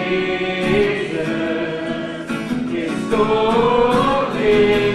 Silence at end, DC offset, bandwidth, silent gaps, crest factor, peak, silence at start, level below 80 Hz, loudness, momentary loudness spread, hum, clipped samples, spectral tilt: 0 s; under 0.1%; 12.5 kHz; none; 14 dB; -4 dBFS; 0 s; -42 dBFS; -18 LUFS; 9 LU; none; under 0.1%; -6 dB/octave